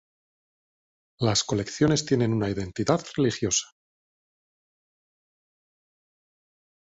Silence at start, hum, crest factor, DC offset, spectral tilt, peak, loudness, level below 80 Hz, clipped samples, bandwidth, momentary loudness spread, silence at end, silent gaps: 1.2 s; none; 20 dB; under 0.1%; -4.5 dB/octave; -8 dBFS; -25 LUFS; -54 dBFS; under 0.1%; 8.2 kHz; 5 LU; 3.2 s; none